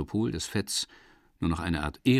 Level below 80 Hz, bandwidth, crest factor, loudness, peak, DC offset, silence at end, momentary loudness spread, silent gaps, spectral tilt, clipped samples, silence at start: -46 dBFS; 15 kHz; 18 dB; -31 LUFS; -12 dBFS; under 0.1%; 0 s; 4 LU; none; -5 dB/octave; under 0.1%; 0 s